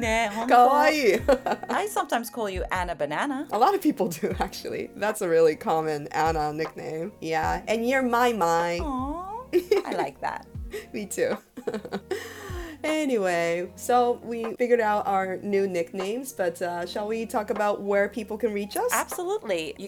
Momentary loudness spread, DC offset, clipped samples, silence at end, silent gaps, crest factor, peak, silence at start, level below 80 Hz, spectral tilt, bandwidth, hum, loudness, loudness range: 12 LU; under 0.1%; under 0.1%; 0 s; none; 20 dB; -6 dBFS; 0 s; -48 dBFS; -4.5 dB/octave; 19.5 kHz; none; -26 LUFS; 4 LU